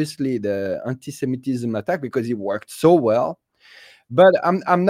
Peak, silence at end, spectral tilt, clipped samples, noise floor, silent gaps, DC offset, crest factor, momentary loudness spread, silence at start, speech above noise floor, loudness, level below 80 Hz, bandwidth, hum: -2 dBFS; 0 s; -6.5 dB/octave; under 0.1%; -48 dBFS; none; under 0.1%; 18 dB; 13 LU; 0 s; 29 dB; -20 LUFS; -64 dBFS; 16 kHz; none